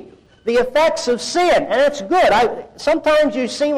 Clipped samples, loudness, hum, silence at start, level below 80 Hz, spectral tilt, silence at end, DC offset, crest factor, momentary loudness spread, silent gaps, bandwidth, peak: under 0.1%; -16 LUFS; none; 0 s; -46 dBFS; -3 dB/octave; 0 s; under 0.1%; 8 dB; 6 LU; none; 13.5 kHz; -8 dBFS